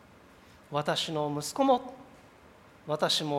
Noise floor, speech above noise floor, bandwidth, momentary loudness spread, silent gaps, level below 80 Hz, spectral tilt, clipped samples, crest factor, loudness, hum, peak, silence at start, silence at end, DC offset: -56 dBFS; 27 dB; 16 kHz; 20 LU; none; -68 dBFS; -4 dB/octave; under 0.1%; 20 dB; -30 LUFS; none; -12 dBFS; 0.7 s; 0 s; under 0.1%